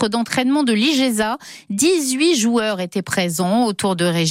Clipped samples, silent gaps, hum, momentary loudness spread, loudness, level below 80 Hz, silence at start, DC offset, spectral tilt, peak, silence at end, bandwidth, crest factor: under 0.1%; none; none; 6 LU; -18 LUFS; -58 dBFS; 0 s; under 0.1%; -4 dB/octave; -4 dBFS; 0 s; 16.5 kHz; 14 dB